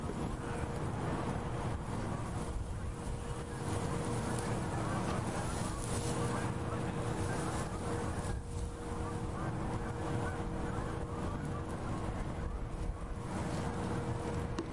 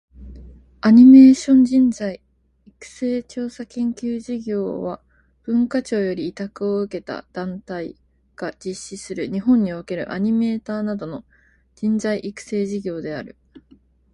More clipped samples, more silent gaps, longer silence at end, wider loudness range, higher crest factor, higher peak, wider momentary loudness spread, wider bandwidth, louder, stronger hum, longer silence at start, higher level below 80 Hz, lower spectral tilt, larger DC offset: neither; neither; second, 0 s vs 0.85 s; second, 3 LU vs 12 LU; about the same, 14 dB vs 18 dB; second, -22 dBFS vs -2 dBFS; second, 5 LU vs 18 LU; about the same, 11.5 kHz vs 10.5 kHz; second, -38 LUFS vs -19 LUFS; neither; second, 0 s vs 0.2 s; first, -46 dBFS vs -52 dBFS; about the same, -6 dB/octave vs -6.5 dB/octave; first, 0.2% vs under 0.1%